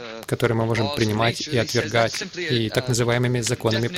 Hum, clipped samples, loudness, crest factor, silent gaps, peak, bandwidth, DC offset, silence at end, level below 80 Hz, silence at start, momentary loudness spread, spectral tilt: none; under 0.1%; -22 LUFS; 16 dB; none; -6 dBFS; 16 kHz; under 0.1%; 0 s; -50 dBFS; 0 s; 3 LU; -4.5 dB/octave